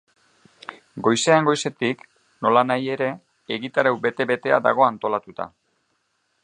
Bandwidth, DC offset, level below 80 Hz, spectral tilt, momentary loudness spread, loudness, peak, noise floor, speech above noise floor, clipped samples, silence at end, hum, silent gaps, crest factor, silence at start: 10.5 kHz; under 0.1%; -70 dBFS; -4.5 dB/octave; 18 LU; -21 LUFS; -2 dBFS; -70 dBFS; 49 dB; under 0.1%; 0.95 s; none; none; 22 dB; 0.7 s